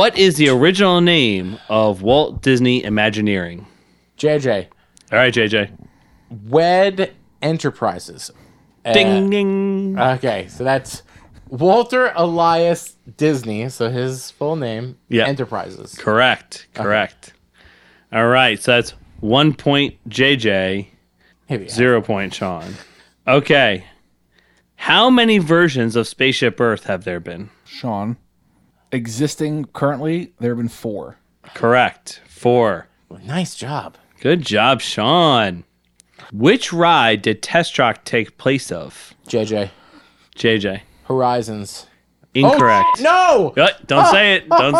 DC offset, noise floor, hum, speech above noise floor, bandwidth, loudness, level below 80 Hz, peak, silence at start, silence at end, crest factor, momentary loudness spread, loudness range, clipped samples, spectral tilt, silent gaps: under 0.1%; -58 dBFS; none; 42 dB; 14.5 kHz; -16 LUFS; -52 dBFS; 0 dBFS; 0 s; 0 s; 16 dB; 15 LU; 6 LU; under 0.1%; -5 dB/octave; none